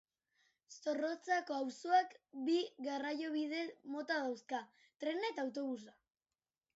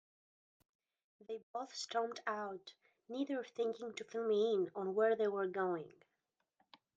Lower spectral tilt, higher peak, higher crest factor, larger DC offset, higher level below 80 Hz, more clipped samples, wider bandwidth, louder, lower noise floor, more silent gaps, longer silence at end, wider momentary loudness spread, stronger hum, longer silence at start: second, -0.5 dB/octave vs -4.5 dB/octave; about the same, -22 dBFS vs -22 dBFS; about the same, 20 dB vs 18 dB; neither; about the same, under -90 dBFS vs under -90 dBFS; neither; second, 7.6 kHz vs 9 kHz; about the same, -40 LUFS vs -39 LUFS; about the same, under -90 dBFS vs -87 dBFS; second, none vs 1.43-1.54 s; second, 0.85 s vs 1.1 s; second, 11 LU vs 15 LU; neither; second, 0.7 s vs 1.3 s